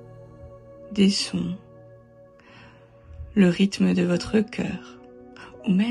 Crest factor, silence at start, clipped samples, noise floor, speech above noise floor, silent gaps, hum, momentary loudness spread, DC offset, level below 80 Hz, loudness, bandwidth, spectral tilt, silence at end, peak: 18 dB; 0 s; under 0.1%; -51 dBFS; 29 dB; none; none; 25 LU; under 0.1%; -52 dBFS; -23 LUFS; 11.5 kHz; -6 dB/octave; 0 s; -8 dBFS